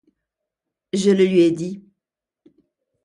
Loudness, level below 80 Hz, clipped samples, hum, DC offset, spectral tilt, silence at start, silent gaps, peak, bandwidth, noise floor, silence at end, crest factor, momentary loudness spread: -18 LUFS; -68 dBFS; under 0.1%; none; under 0.1%; -6.5 dB/octave; 0.95 s; none; -6 dBFS; 11.5 kHz; -85 dBFS; 1.25 s; 16 dB; 15 LU